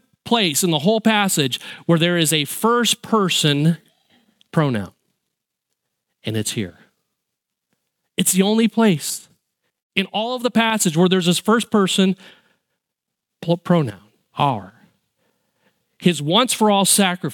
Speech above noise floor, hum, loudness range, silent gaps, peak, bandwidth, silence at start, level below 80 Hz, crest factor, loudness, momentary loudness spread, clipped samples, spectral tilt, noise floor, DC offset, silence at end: 64 dB; none; 9 LU; 9.82-9.90 s; 0 dBFS; 17.5 kHz; 0.25 s; -66 dBFS; 20 dB; -18 LUFS; 11 LU; under 0.1%; -4 dB/octave; -82 dBFS; under 0.1%; 0 s